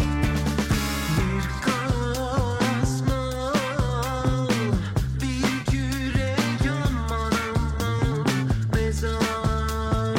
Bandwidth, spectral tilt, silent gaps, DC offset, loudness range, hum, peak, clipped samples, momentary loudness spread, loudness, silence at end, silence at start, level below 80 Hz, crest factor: 16.5 kHz; -5.5 dB/octave; none; under 0.1%; 0 LU; none; -10 dBFS; under 0.1%; 2 LU; -25 LUFS; 0 s; 0 s; -30 dBFS; 12 dB